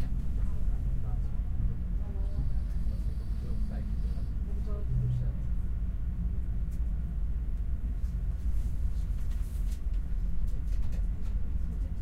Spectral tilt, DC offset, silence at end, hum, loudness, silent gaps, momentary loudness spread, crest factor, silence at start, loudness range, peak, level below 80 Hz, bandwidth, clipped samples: -8.5 dB/octave; under 0.1%; 0 s; none; -35 LUFS; none; 2 LU; 10 dB; 0 s; 1 LU; -18 dBFS; -32 dBFS; 4.8 kHz; under 0.1%